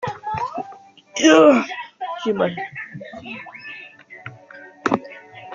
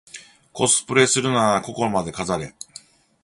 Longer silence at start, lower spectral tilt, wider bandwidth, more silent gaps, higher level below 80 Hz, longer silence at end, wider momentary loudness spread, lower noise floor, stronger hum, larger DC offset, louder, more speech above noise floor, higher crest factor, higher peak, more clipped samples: second, 0 s vs 0.15 s; about the same, -4 dB/octave vs -3 dB/octave; second, 7.6 kHz vs 11.5 kHz; neither; second, -62 dBFS vs -54 dBFS; second, 0 s vs 0.75 s; first, 25 LU vs 22 LU; second, -43 dBFS vs -47 dBFS; neither; neither; about the same, -19 LUFS vs -20 LUFS; about the same, 28 dB vs 26 dB; about the same, 20 dB vs 22 dB; about the same, -2 dBFS vs -2 dBFS; neither